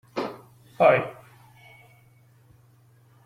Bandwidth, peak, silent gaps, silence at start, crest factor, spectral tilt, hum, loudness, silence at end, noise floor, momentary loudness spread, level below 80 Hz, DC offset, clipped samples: 14.5 kHz; -6 dBFS; none; 0.15 s; 22 dB; -6.5 dB/octave; none; -23 LUFS; 2.15 s; -57 dBFS; 19 LU; -68 dBFS; under 0.1%; under 0.1%